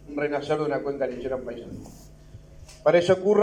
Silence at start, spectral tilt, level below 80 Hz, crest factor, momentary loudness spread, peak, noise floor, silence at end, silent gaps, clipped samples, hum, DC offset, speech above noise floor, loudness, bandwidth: 0 s; -6 dB/octave; -52 dBFS; 18 dB; 19 LU; -6 dBFS; -47 dBFS; 0 s; none; under 0.1%; none; under 0.1%; 23 dB; -25 LUFS; 10.5 kHz